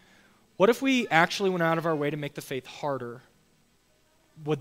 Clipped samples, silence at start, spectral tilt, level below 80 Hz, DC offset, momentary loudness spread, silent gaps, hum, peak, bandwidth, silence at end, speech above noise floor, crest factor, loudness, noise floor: under 0.1%; 0.6 s; -5 dB/octave; -70 dBFS; under 0.1%; 14 LU; none; none; -4 dBFS; 16 kHz; 0 s; 39 dB; 24 dB; -26 LUFS; -65 dBFS